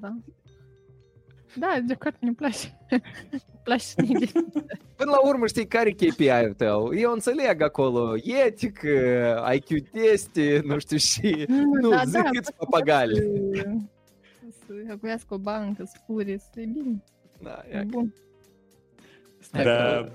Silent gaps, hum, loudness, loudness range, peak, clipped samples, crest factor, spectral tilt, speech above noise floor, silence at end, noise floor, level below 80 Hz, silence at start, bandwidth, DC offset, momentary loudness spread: none; none; -24 LUFS; 11 LU; -8 dBFS; under 0.1%; 18 dB; -5 dB/octave; 35 dB; 0 s; -59 dBFS; -56 dBFS; 0 s; 16 kHz; under 0.1%; 14 LU